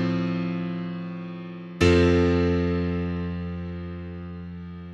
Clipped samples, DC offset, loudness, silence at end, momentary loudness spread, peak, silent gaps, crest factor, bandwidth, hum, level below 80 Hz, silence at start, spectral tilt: under 0.1%; under 0.1%; -25 LUFS; 0 s; 18 LU; -6 dBFS; none; 20 dB; 9.8 kHz; none; -42 dBFS; 0 s; -7.5 dB/octave